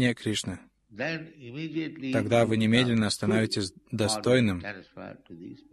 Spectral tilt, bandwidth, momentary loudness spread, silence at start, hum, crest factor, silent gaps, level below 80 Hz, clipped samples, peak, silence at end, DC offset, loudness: -5 dB/octave; 13 kHz; 21 LU; 0 s; none; 18 dB; none; -54 dBFS; under 0.1%; -8 dBFS; 0.15 s; under 0.1%; -27 LUFS